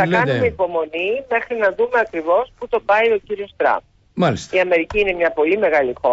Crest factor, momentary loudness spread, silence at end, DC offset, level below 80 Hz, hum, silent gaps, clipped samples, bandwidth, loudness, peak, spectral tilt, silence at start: 12 dB; 6 LU; 0 s; under 0.1%; -46 dBFS; none; none; under 0.1%; 8 kHz; -18 LUFS; -6 dBFS; -6 dB/octave; 0 s